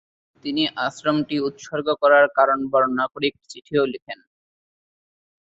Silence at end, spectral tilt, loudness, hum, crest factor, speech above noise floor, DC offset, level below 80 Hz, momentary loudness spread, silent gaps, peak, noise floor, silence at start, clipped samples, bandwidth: 1.3 s; -5 dB/octave; -21 LUFS; none; 20 dB; over 69 dB; under 0.1%; -66 dBFS; 13 LU; 4.02-4.06 s; -4 dBFS; under -90 dBFS; 0.45 s; under 0.1%; 8 kHz